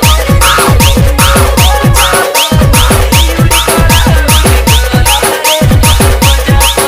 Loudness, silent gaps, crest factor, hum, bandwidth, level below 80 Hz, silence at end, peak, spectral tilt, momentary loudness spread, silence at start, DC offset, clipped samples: -6 LUFS; none; 6 dB; none; 16.5 kHz; -10 dBFS; 0 s; 0 dBFS; -4 dB/octave; 1 LU; 0 s; under 0.1%; 1%